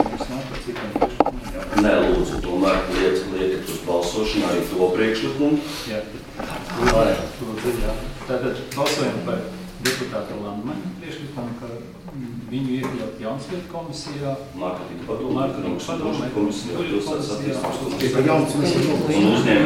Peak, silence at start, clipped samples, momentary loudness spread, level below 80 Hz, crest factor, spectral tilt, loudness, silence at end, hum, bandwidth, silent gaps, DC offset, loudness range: 0 dBFS; 0 s; under 0.1%; 13 LU; -38 dBFS; 22 dB; -5.5 dB/octave; -23 LUFS; 0 s; none; 16.5 kHz; none; under 0.1%; 8 LU